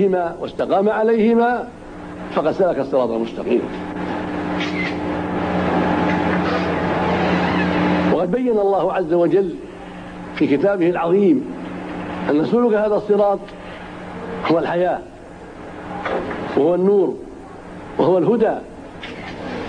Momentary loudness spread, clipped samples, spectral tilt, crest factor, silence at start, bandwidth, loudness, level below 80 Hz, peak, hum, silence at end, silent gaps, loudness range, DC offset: 17 LU; under 0.1%; -7.5 dB/octave; 14 dB; 0 s; 10 kHz; -19 LUFS; -46 dBFS; -4 dBFS; none; 0 s; none; 3 LU; under 0.1%